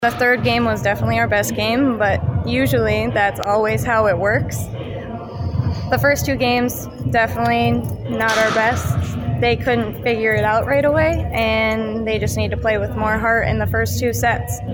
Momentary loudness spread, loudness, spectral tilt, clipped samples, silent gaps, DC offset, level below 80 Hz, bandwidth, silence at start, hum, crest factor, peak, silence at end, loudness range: 6 LU; -18 LUFS; -5.5 dB/octave; under 0.1%; none; under 0.1%; -34 dBFS; 17.5 kHz; 0 s; none; 14 dB; -4 dBFS; 0 s; 2 LU